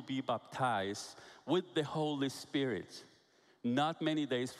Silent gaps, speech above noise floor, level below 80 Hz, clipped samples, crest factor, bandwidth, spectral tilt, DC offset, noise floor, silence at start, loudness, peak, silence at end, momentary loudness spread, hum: none; 32 dB; -80 dBFS; under 0.1%; 16 dB; 14 kHz; -5 dB/octave; under 0.1%; -69 dBFS; 0 s; -36 LUFS; -20 dBFS; 0 s; 12 LU; none